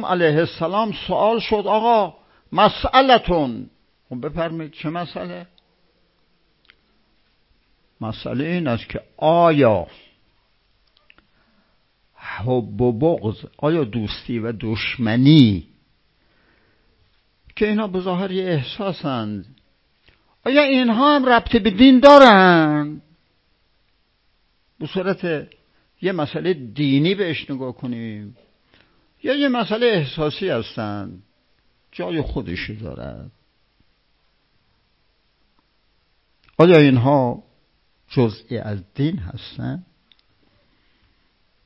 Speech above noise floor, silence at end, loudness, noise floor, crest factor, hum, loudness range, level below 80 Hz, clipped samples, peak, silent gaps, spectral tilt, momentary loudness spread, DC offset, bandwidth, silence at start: 47 dB; 1.85 s; -18 LUFS; -64 dBFS; 20 dB; none; 17 LU; -46 dBFS; under 0.1%; 0 dBFS; none; -7.5 dB/octave; 19 LU; under 0.1%; 8 kHz; 0 s